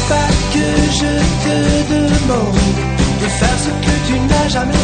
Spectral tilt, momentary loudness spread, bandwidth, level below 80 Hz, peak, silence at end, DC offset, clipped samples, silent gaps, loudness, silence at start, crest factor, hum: -5 dB/octave; 2 LU; 9.6 kHz; -22 dBFS; 0 dBFS; 0 s; under 0.1%; under 0.1%; none; -14 LUFS; 0 s; 12 dB; none